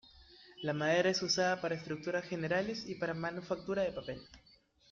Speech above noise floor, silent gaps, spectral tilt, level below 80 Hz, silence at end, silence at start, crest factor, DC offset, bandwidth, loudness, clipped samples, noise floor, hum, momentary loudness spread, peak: 24 dB; none; -4 dB/octave; -68 dBFS; 0.55 s; 0.15 s; 18 dB; under 0.1%; 7.6 kHz; -35 LUFS; under 0.1%; -59 dBFS; none; 12 LU; -18 dBFS